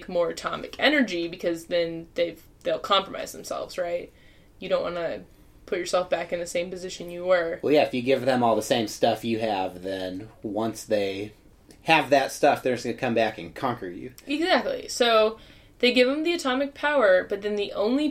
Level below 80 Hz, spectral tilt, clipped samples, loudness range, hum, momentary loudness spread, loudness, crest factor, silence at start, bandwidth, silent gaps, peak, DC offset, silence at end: -56 dBFS; -4 dB/octave; under 0.1%; 6 LU; none; 13 LU; -25 LUFS; 22 dB; 0 s; 16 kHz; none; -4 dBFS; under 0.1%; 0 s